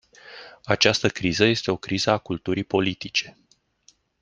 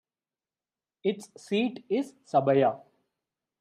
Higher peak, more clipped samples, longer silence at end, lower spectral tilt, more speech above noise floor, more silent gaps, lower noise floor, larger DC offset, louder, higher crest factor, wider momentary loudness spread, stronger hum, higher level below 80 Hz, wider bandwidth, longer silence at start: first, -2 dBFS vs -12 dBFS; neither; about the same, 0.9 s vs 0.85 s; second, -4 dB/octave vs -6.5 dB/octave; second, 38 dB vs over 63 dB; neither; second, -61 dBFS vs under -90 dBFS; neither; first, -23 LUFS vs -28 LUFS; about the same, 24 dB vs 20 dB; first, 22 LU vs 9 LU; neither; first, -56 dBFS vs -82 dBFS; second, 10 kHz vs 12.5 kHz; second, 0.25 s vs 1.05 s